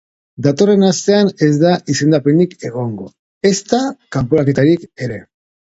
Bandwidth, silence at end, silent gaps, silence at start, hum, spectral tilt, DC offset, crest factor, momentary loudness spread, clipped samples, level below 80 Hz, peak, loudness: 8 kHz; 0.55 s; 3.19-3.41 s; 0.4 s; none; -6 dB/octave; under 0.1%; 14 dB; 13 LU; under 0.1%; -50 dBFS; 0 dBFS; -15 LUFS